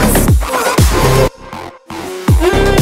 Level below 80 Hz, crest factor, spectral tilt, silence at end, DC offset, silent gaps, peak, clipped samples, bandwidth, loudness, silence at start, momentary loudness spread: -18 dBFS; 12 dB; -5 dB/octave; 0 s; under 0.1%; none; 0 dBFS; under 0.1%; 16.5 kHz; -12 LUFS; 0 s; 17 LU